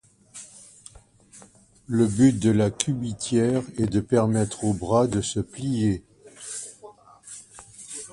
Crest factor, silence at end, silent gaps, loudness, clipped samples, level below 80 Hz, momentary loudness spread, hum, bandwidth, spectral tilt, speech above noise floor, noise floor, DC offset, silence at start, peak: 22 dB; 0.05 s; none; -24 LUFS; under 0.1%; -50 dBFS; 22 LU; none; 11.5 kHz; -6 dB/octave; 30 dB; -53 dBFS; under 0.1%; 0.35 s; -4 dBFS